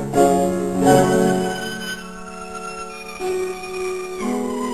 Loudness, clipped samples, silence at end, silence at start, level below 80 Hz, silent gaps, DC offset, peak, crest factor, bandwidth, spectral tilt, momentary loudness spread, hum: -20 LUFS; under 0.1%; 0 s; 0 s; -48 dBFS; none; 0.7%; -2 dBFS; 18 dB; 14 kHz; -5.5 dB/octave; 16 LU; none